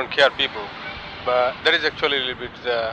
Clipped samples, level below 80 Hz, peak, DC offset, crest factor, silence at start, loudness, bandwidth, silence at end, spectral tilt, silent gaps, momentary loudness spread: under 0.1%; -52 dBFS; -4 dBFS; under 0.1%; 18 dB; 0 s; -21 LUFS; 9.4 kHz; 0 s; -3.5 dB/octave; none; 13 LU